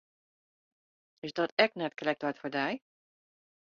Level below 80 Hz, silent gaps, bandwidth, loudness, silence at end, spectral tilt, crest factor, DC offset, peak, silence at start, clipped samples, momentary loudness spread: -78 dBFS; 1.52-1.57 s; 7.2 kHz; -32 LUFS; 0.9 s; -2 dB/octave; 28 dB; under 0.1%; -8 dBFS; 1.25 s; under 0.1%; 13 LU